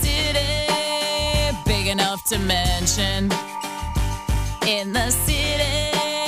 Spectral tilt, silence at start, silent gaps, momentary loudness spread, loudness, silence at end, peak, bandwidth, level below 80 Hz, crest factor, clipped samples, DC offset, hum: -3 dB/octave; 0 s; none; 6 LU; -21 LUFS; 0 s; -8 dBFS; 16 kHz; -28 dBFS; 14 dB; under 0.1%; under 0.1%; none